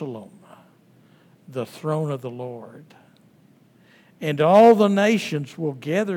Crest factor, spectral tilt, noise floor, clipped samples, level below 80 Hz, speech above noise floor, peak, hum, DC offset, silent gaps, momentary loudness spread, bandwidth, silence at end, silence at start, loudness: 20 dB; -6.5 dB/octave; -55 dBFS; under 0.1%; -82 dBFS; 35 dB; -2 dBFS; none; under 0.1%; none; 22 LU; 16.5 kHz; 0 s; 0 s; -20 LUFS